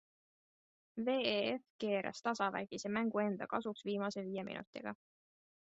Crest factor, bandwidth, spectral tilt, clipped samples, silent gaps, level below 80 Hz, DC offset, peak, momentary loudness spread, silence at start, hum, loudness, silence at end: 20 dB; 8 kHz; -3.5 dB/octave; under 0.1%; 1.70-1.79 s, 4.67-4.73 s; -80 dBFS; under 0.1%; -20 dBFS; 11 LU; 0.95 s; none; -39 LUFS; 0.75 s